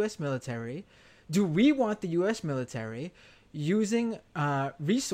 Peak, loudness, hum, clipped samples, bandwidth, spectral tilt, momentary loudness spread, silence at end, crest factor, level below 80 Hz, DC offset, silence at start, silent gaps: -12 dBFS; -30 LUFS; none; under 0.1%; 15 kHz; -6 dB/octave; 15 LU; 0 s; 16 dB; -64 dBFS; under 0.1%; 0 s; none